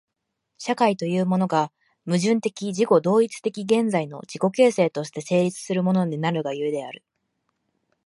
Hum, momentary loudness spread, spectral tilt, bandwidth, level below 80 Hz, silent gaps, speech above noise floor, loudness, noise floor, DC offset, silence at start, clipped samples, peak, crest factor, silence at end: none; 12 LU; -6 dB/octave; 11.5 kHz; -70 dBFS; none; 56 dB; -23 LUFS; -78 dBFS; under 0.1%; 0.6 s; under 0.1%; -4 dBFS; 18 dB; 1.1 s